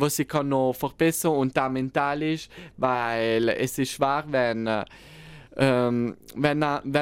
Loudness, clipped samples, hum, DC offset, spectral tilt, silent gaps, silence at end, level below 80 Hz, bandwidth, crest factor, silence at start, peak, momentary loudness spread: -25 LUFS; under 0.1%; none; under 0.1%; -5 dB/octave; none; 0 s; -56 dBFS; 16.5 kHz; 18 dB; 0 s; -6 dBFS; 7 LU